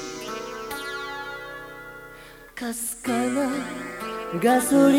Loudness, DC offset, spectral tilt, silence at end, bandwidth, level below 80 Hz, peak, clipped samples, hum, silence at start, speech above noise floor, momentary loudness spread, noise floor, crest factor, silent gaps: -26 LUFS; under 0.1%; -4 dB/octave; 0 s; 17.5 kHz; -56 dBFS; -6 dBFS; under 0.1%; none; 0 s; 23 dB; 20 LU; -45 dBFS; 18 dB; none